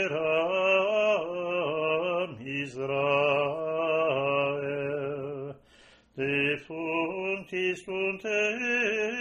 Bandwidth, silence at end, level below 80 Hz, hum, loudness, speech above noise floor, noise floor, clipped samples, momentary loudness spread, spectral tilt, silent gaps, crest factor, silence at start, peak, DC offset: 10.5 kHz; 0 s; -68 dBFS; none; -28 LUFS; 29 dB; -58 dBFS; under 0.1%; 9 LU; -5 dB/octave; none; 16 dB; 0 s; -12 dBFS; under 0.1%